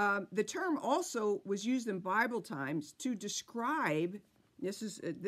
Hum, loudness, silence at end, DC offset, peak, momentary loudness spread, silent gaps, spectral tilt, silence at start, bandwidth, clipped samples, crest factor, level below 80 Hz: none; -36 LUFS; 0 s; under 0.1%; -18 dBFS; 8 LU; none; -4 dB/octave; 0 s; 15.5 kHz; under 0.1%; 18 dB; -84 dBFS